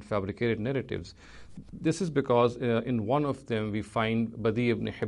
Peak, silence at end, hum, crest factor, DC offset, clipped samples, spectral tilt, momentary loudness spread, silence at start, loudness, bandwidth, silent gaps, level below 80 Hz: -12 dBFS; 0 s; none; 18 dB; under 0.1%; under 0.1%; -7 dB/octave; 12 LU; 0 s; -29 LUFS; 11 kHz; none; -56 dBFS